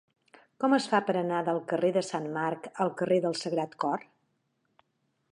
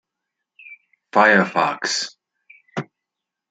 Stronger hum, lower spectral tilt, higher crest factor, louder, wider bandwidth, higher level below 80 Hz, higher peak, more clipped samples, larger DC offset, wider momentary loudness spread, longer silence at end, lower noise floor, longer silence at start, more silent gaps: neither; first, -5.5 dB/octave vs -3.5 dB/octave; about the same, 20 dB vs 20 dB; second, -29 LUFS vs -18 LUFS; first, 11 kHz vs 9.4 kHz; second, -82 dBFS vs -72 dBFS; second, -10 dBFS vs -2 dBFS; neither; neither; second, 6 LU vs 18 LU; first, 1.3 s vs 0.65 s; second, -76 dBFS vs -84 dBFS; about the same, 0.6 s vs 0.7 s; neither